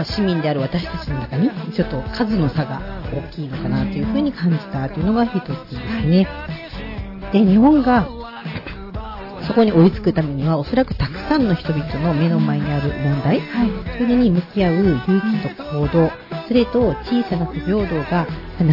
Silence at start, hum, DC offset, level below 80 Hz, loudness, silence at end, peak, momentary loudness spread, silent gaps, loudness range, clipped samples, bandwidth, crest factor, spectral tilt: 0 s; none; under 0.1%; -34 dBFS; -19 LUFS; 0 s; -4 dBFS; 14 LU; none; 4 LU; under 0.1%; 5.8 kHz; 14 dB; -9 dB/octave